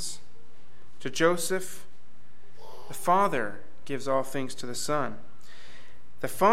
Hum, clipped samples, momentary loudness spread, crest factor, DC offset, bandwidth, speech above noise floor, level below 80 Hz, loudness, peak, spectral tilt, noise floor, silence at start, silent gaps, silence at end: none; under 0.1%; 24 LU; 22 dB; 4%; 16.5 kHz; 32 dB; -66 dBFS; -29 LUFS; -10 dBFS; -4 dB/octave; -60 dBFS; 0 s; none; 0 s